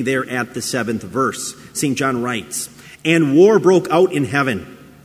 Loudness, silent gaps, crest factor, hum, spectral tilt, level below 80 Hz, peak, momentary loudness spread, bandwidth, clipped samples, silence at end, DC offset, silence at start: -17 LUFS; none; 16 dB; none; -5 dB/octave; -54 dBFS; 0 dBFS; 14 LU; 16 kHz; under 0.1%; 0.3 s; under 0.1%; 0 s